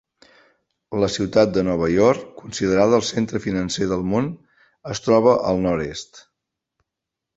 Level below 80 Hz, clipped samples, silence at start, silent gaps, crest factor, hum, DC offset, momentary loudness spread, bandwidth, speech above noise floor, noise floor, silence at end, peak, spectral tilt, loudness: -48 dBFS; under 0.1%; 0.9 s; none; 20 dB; none; under 0.1%; 14 LU; 8.2 kHz; 65 dB; -84 dBFS; 1.15 s; -2 dBFS; -5.5 dB/octave; -20 LUFS